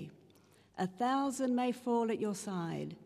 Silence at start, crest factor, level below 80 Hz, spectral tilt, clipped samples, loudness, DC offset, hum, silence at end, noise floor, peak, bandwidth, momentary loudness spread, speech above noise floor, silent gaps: 0 s; 14 dB; -80 dBFS; -5.5 dB/octave; under 0.1%; -35 LUFS; under 0.1%; none; 0 s; -64 dBFS; -22 dBFS; 14.5 kHz; 7 LU; 30 dB; none